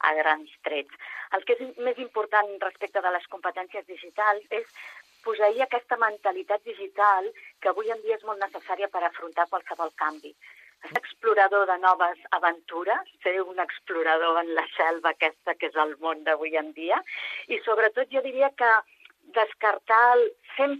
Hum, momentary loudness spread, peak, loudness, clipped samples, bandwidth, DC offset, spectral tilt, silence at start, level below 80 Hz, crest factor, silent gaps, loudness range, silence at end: none; 11 LU; -6 dBFS; -26 LUFS; under 0.1%; 13 kHz; under 0.1%; -3 dB/octave; 0 s; -84 dBFS; 20 dB; none; 4 LU; 0 s